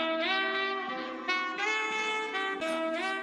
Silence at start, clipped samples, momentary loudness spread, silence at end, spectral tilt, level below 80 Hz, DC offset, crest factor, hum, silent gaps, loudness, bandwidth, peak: 0 s; under 0.1%; 4 LU; 0 s; -1.5 dB/octave; -76 dBFS; under 0.1%; 16 dB; none; none; -30 LUFS; 13 kHz; -16 dBFS